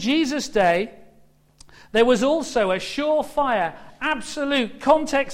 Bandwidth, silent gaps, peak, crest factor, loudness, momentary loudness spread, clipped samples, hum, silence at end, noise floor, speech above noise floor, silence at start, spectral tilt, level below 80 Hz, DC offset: 15.5 kHz; none; -4 dBFS; 18 dB; -21 LUFS; 7 LU; under 0.1%; none; 0 s; -55 dBFS; 34 dB; 0 s; -4 dB/octave; -50 dBFS; under 0.1%